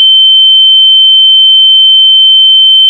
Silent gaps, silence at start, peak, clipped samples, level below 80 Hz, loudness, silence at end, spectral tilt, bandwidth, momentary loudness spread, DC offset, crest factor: none; 0 s; 0 dBFS; 4%; under -90 dBFS; 0 LUFS; 0 s; 9 dB/octave; 9.8 kHz; 0 LU; under 0.1%; 4 dB